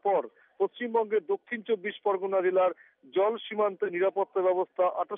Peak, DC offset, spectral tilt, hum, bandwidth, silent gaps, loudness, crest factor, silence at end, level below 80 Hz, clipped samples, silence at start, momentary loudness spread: -16 dBFS; under 0.1%; -3 dB/octave; none; 3.8 kHz; none; -29 LUFS; 12 dB; 0 s; under -90 dBFS; under 0.1%; 0.05 s; 6 LU